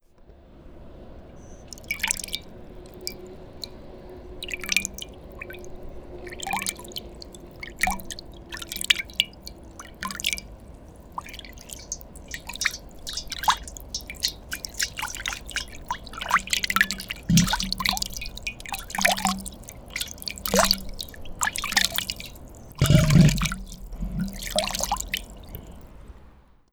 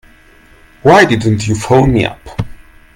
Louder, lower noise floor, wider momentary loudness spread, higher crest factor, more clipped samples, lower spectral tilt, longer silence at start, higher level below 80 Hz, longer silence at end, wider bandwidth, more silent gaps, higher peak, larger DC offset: second, -26 LUFS vs -11 LUFS; first, -52 dBFS vs -43 dBFS; first, 22 LU vs 17 LU; first, 26 dB vs 12 dB; second, under 0.1% vs 0.3%; second, -3.5 dB/octave vs -6 dB/octave; second, 0.2 s vs 0.85 s; second, -40 dBFS vs -32 dBFS; second, 0.3 s vs 0.45 s; first, over 20 kHz vs 15.5 kHz; neither; about the same, -2 dBFS vs 0 dBFS; neither